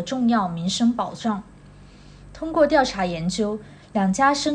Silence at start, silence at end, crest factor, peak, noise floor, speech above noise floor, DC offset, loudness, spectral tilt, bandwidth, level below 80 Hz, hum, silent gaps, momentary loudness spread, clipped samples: 0 s; 0 s; 18 dB; -6 dBFS; -46 dBFS; 25 dB; under 0.1%; -22 LUFS; -5 dB/octave; 10 kHz; -48 dBFS; none; none; 10 LU; under 0.1%